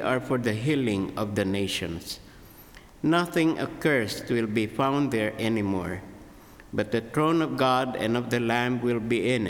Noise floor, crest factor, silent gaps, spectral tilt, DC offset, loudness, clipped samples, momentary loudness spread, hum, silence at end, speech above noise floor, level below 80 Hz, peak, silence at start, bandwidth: -49 dBFS; 18 dB; none; -6 dB/octave; under 0.1%; -26 LUFS; under 0.1%; 8 LU; none; 0 s; 23 dB; -56 dBFS; -10 dBFS; 0 s; 18.5 kHz